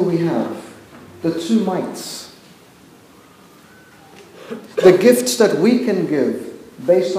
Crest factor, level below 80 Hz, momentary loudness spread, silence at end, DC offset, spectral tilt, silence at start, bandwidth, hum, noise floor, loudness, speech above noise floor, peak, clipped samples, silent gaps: 18 dB; -64 dBFS; 21 LU; 0 s; under 0.1%; -5 dB/octave; 0 s; 16 kHz; none; -46 dBFS; -17 LUFS; 30 dB; 0 dBFS; under 0.1%; none